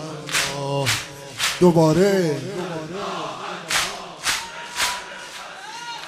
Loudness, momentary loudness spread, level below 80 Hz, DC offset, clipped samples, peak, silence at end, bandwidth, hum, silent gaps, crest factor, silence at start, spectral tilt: -22 LUFS; 17 LU; -54 dBFS; under 0.1%; under 0.1%; -4 dBFS; 0 s; 15.5 kHz; none; none; 20 dB; 0 s; -4 dB/octave